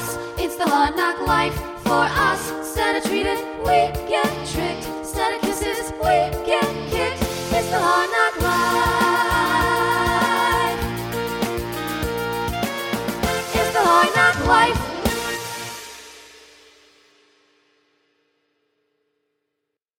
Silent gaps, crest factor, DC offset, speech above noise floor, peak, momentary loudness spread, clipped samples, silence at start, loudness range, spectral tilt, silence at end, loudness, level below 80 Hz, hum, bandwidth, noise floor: none; 20 dB; under 0.1%; 59 dB; -2 dBFS; 10 LU; under 0.1%; 0 s; 5 LU; -4 dB/octave; 3.6 s; -20 LUFS; -38 dBFS; none; 17.5 kHz; -80 dBFS